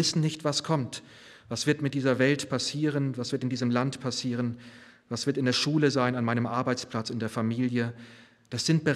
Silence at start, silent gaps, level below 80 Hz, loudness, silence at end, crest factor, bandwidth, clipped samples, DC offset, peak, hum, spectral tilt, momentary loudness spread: 0 s; none; -70 dBFS; -28 LUFS; 0 s; 18 dB; 13.5 kHz; under 0.1%; under 0.1%; -10 dBFS; none; -5 dB/octave; 9 LU